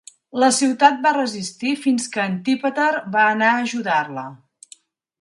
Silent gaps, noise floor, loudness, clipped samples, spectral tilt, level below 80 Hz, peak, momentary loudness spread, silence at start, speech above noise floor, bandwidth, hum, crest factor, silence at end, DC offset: none; -50 dBFS; -19 LUFS; under 0.1%; -3.5 dB/octave; -72 dBFS; 0 dBFS; 10 LU; 0.35 s; 31 dB; 11.5 kHz; none; 20 dB; 0.85 s; under 0.1%